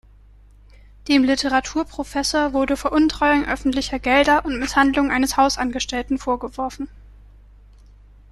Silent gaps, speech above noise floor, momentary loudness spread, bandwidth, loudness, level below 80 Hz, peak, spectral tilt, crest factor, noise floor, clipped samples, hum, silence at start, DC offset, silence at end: none; 28 dB; 9 LU; 13.5 kHz; -20 LUFS; -40 dBFS; -4 dBFS; -3 dB/octave; 18 dB; -48 dBFS; under 0.1%; 50 Hz at -40 dBFS; 1.05 s; under 0.1%; 1.4 s